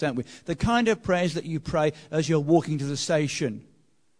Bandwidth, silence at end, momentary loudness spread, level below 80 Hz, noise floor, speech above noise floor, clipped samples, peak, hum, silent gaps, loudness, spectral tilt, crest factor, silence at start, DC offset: 10.5 kHz; 0.6 s; 9 LU; -48 dBFS; -65 dBFS; 40 dB; under 0.1%; -8 dBFS; none; none; -26 LUFS; -5.5 dB/octave; 18 dB; 0 s; 0.1%